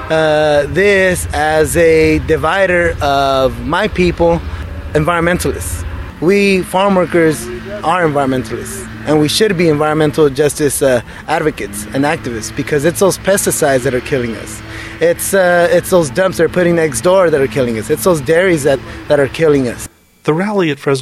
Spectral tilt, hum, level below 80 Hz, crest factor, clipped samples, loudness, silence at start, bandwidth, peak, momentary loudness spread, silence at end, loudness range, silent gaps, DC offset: -5 dB/octave; none; -32 dBFS; 12 dB; under 0.1%; -13 LUFS; 0 s; 14.5 kHz; 0 dBFS; 10 LU; 0 s; 3 LU; none; under 0.1%